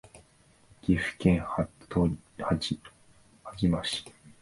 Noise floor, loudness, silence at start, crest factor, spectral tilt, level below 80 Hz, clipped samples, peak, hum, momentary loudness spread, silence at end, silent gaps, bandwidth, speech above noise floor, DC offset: -61 dBFS; -30 LUFS; 0.15 s; 22 dB; -6 dB/octave; -46 dBFS; under 0.1%; -10 dBFS; none; 12 LU; 0.15 s; none; 11.5 kHz; 33 dB; under 0.1%